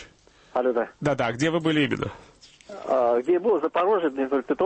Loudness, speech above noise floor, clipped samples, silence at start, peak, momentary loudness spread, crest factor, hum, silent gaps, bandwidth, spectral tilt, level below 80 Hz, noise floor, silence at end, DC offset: -24 LUFS; 31 dB; under 0.1%; 0 s; -12 dBFS; 8 LU; 12 dB; none; none; 8.8 kHz; -6 dB/octave; -58 dBFS; -54 dBFS; 0 s; under 0.1%